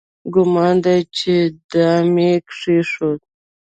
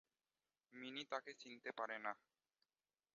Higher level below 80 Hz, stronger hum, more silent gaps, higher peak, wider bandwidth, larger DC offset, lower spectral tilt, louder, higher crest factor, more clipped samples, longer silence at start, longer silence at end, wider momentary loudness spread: first, -56 dBFS vs under -90 dBFS; neither; first, 1.64-1.69 s vs none; first, -2 dBFS vs -30 dBFS; first, 9 kHz vs 7.2 kHz; neither; first, -7 dB/octave vs 0 dB/octave; first, -16 LUFS vs -50 LUFS; second, 14 dB vs 24 dB; neither; second, 0.25 s vs 0.7 s; second, 0.45 s vs 1 s; second, 6 LU vs 10 LU